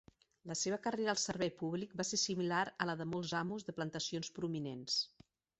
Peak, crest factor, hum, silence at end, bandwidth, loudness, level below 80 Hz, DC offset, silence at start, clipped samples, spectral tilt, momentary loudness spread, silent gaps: -18 dBFS; 22 dB; none; 0.5 s; 8.2 kHz; -38 LUFS; -74 dBFS; under 0.1%; 0.45 s; under 0.1%; -3.5 dB/octave; 7 LU; none